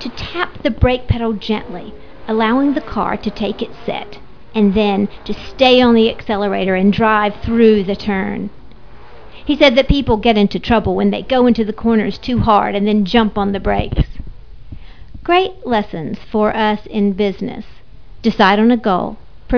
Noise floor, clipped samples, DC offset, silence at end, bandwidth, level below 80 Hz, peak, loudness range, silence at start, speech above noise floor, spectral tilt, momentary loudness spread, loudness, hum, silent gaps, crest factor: -39 dBFS; under 0.1%; 2%; 0 s; 5.4 kHz; -30 dBFS; 0 dBFS; 5 LU; 0 s; 25 dB; -7.5 dB/octave; 14 LU; -15 LUFS; none; none; 16 dB